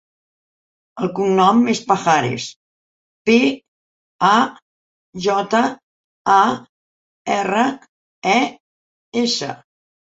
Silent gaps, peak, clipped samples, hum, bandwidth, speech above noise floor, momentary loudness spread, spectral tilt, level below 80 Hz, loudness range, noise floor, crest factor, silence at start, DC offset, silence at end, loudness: 2.56-3.25 s, 3.68-4.19 s, 4.62-5.13 s, 5.83-6.25 s, 6.69-7.25 s, 7.89-8.22 s, 8.60-9.12 s; -2 dBFS; under 0.1%; none; 8 kHz; over 73 dB; 15 LU; -4.5 dB/octave; -62 dBFS; 3 LU; under -90 dBFS; 18 dB; 0.95 s; under 0.1%; 0.6 s; -18 LUFS